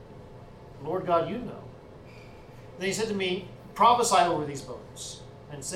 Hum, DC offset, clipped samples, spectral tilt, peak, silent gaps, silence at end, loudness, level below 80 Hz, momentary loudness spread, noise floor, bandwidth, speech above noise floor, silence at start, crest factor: none; under 0.1%; under 0.1%; -3.5 dB/octave; -8 dBFS; none; 0 s; -26 LUFS; -56 dBFS; 26 LU; -47 dBFS; 16.5 kHz; 20 dB; 0 s; 22 dB